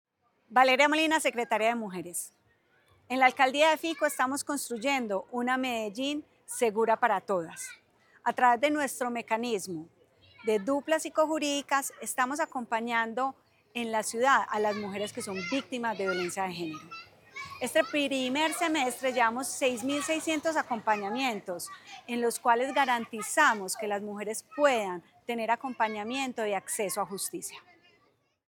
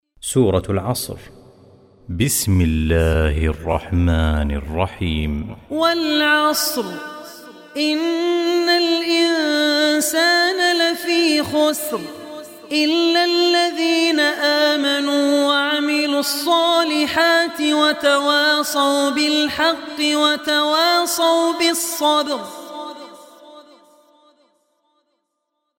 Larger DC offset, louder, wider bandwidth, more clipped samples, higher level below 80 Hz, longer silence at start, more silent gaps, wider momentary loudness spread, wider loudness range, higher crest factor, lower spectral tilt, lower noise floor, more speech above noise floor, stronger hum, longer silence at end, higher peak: neither; second, -29 LUFS vs -17 LUFS; first, 19 kHz vs 17 kHz; neither; second, -80 dBFS vs -34 dBFS; first, 0.5 s vs 0.25 s; neither; about the same, 12 LU vs 11 LU; about the same, 3 LU vs 4 LU; first, 22 dB vs 16 dB; second, -2.5 dB/octave vs -4 dB/octave; second, -70 dBFS vs -75 dBFS; second, 41 dB vs 57 dB; neither; second, 0.9 s vs 2.2 s; second, -8 dBFS vs -2 dBFS